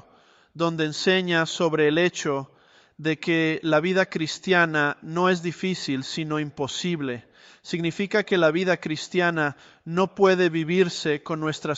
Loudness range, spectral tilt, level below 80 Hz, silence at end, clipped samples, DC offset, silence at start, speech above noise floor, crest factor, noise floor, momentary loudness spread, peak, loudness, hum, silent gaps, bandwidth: 3 LU; -5 dB/octave; -66 dBFS; 0 s; under 0.1%; under 0.1%; 0.55 s; 33 dB; 18 dB; -57 dBFS; 8 LU; -6 dBFS; -24 LUFS; none; none; 8.2 kHz